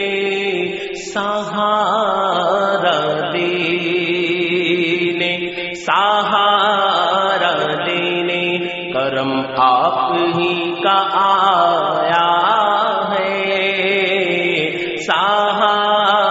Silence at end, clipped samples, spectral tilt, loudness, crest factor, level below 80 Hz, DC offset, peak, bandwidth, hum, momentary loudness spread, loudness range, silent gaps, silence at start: 0 s; under 0.1%; -1.5 dB/octave; -16 LUFS; 16 dB; -60 dBFS; under 0.1%; 0 dBFS; 8 kHz; none; 6 LU; 2 LU; none; 0 s